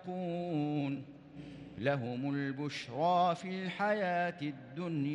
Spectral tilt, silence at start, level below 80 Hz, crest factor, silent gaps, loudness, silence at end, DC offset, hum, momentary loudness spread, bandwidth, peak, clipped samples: -7 dB/octave; 0 s; -72 dBFS; 16 dB; none; -35 LUFS; 0 s; under 0.1%; none; 14 LU; 11 kHz; -18 dBFS; under 0.1%